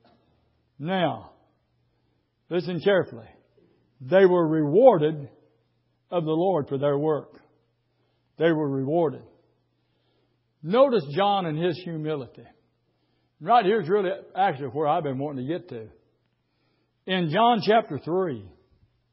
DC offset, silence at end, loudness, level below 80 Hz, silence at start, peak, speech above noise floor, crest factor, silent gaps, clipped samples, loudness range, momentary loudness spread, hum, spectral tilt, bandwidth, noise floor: under 0.1%; 0.65 s; -24 LUFS; -70 dBFS; 0.8 s; -4 dBFS; 48 dB; 22 dB; none; under 0.1%; 7 LU; 18 LU; none; -10.5 dB/octave; 5.8 kHz; -71 dBFS